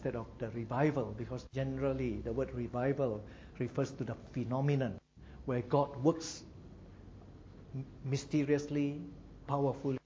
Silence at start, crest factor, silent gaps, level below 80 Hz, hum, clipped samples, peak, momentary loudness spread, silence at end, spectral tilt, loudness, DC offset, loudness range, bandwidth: 0 s; 20 dB; none; -56 dBFS; none; under 0.1%; -16 dBFS; 21 LU; 0.05 s; -7 dB/octave; -36 LUFS; under 0.1%; 2 LU; 7.8 kHz